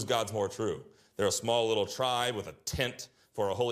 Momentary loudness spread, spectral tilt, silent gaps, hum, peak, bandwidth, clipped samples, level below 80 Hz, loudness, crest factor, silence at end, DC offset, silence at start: 13 LU; -3.5 dB/octave; none; none; -14 dBFS; 15.5 kHz; under 0.1%; -60 dBFS; -32 LUFS; 18 dB; 0 s; under 0.1%; 0 s